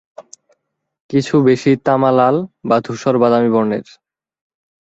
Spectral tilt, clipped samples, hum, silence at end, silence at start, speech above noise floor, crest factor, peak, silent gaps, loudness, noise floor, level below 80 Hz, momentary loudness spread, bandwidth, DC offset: -7 dB/octave; under 0.1%; none; 1.1 s; 0.2 s; 53 dB; 14 dB; -2 dBFS; 1.00-1.09 s; -15 LUFS; -67 dBFS; -56 dBFS; 7 LU; 8 kHz; under 0.1%